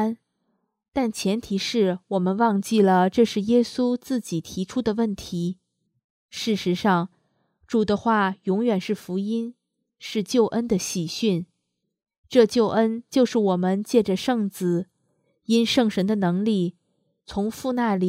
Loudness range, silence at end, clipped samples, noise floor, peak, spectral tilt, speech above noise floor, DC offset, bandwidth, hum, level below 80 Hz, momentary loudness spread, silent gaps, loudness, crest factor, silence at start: 5 LU; 0 s; under 0.1%; -78 dBFS; -4 dBFS; -5.5 dB/octave; 56 dB; under 0.1%; 15.5 kHz; none; -58 dBFS; 10 LU; 0.88-0.92 s, 6.04-6.29 s, 12.18-12.24 s; -23 LUFS; 20 dB; 0 s